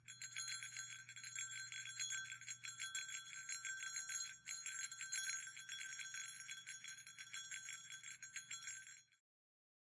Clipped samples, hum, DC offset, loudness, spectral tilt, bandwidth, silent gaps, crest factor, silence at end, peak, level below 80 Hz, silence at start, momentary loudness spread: under 0.1%; none; under 0.1%; -48 LUFS; 3 dB/octave; 12 kHz; none; 20 dB; 0.65 s; -32 dBFS; under -90 dBFS; 0 s; 7 LU